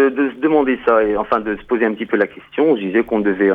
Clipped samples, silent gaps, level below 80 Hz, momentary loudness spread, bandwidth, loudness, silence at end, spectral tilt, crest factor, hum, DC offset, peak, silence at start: under 0.1%; none; -48 dBFS; 4 LU; 4.6 kHz; -17 LUFS; 0 s; -8.5 dB/octave; 14 dB; none; under 0.1%; -2 dBFS; 0 s